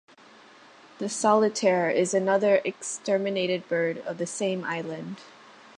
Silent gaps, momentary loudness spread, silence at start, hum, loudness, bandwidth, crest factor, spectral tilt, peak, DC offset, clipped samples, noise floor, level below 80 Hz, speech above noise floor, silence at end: none; 13 LU; 1 s; none; -26 LUFS; 11.5 kHz; 18 dB; -4 dB/octave; -8 dBFS; under 0.1%; under 0.1%; -52 dBFS; -78 dBFS; 27 dB; 0.5 s